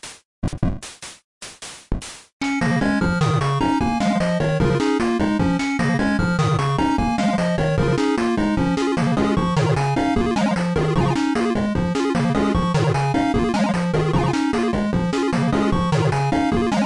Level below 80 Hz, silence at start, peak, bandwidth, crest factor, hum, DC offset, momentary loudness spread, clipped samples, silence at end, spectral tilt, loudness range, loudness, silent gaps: -36 dBFS; 0.05 s; -8 dBFS; 11.5 kHz; 12 dB; none; 0.2%; 9 LU; under 0.1%; 0 s; -6.5 dB/octave; 2 LU; -20 LUFS; 0.25-0.42 s, 1.24-1.41 s, 2.33-2.40 s